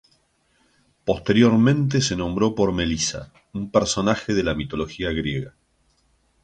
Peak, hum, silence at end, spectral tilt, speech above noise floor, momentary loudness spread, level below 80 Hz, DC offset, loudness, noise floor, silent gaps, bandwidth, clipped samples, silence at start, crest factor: -4 dBFS; none; 0.95 s; -5 dB/octave; 43 dB; 14 LU; -42 dBFS; under 0.1%; -22 LUFS; -64 dBFS; none; 9.4 kHz; under 0.1%; 1.05 s; 18 dB